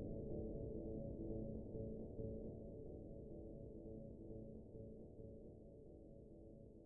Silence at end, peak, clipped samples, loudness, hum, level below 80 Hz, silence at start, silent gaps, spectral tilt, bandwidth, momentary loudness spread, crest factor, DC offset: 0 s; -36 dBFS; under 0.1%; -53 LUFS; none; -60 dBFS; 0 s; none; -9.5 dB/octave; 1.2 kHz; 12 LU; 16 dB; under 0.1%